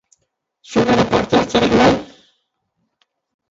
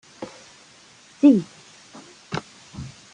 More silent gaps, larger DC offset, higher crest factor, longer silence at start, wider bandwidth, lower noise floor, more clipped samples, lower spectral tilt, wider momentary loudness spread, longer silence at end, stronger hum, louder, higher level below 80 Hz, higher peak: neither; neither; about the same, 18 dB vs 20 dB; first, 0.7 s vs 0.2 s; second, 8 kHz vs 10 kHz; first, -71 dBFS vs -51 dBFS; neither; about the same, -5.5 dB/octave vs -6.5 dB/octave; second, 7 LU vs 28 LU; first, 1.45 s vs 0.25 s; neither; first, -15 LUFS vs -20 LUFS; first, -42 dBFS vs -60 dBFS; first, 0 dBFS vs -4 dBFS